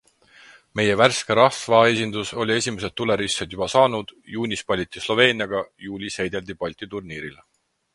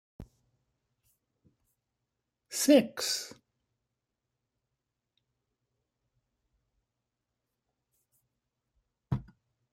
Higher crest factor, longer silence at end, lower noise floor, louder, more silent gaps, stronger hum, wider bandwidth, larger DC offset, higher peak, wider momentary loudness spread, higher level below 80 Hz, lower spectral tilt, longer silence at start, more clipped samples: about the same, 22 dB vs 26 dB; about the same, 0.6 s vs 0.5 s; second, -51 dBFS vs -86 dBFS; first, -21 LUFS vs -29 LUFS; neither; neither; second, 11.5 kHz vs 16 kHz; neither; first, 0 dBFS vs -10 dBFS; about the same, 15 LU vs 15 LU; first, -54 dBFS vs -64 dBFS; about the same, -4 dB/octave vs -4 dB/octave; first, 0.75 s vs 0.2 s; neither